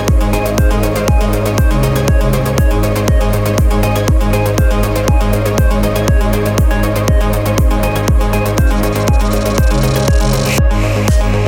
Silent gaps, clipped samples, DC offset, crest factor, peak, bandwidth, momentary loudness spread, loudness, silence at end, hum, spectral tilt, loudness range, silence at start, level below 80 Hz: none; under 0.1%; under 0.1%; 10 dB; 0 dBFS; 18 kHz; 1 LU; -13 LUFS; 0 s; none; -6 dB/octave; 0 LU; 0 s; -14 dBFS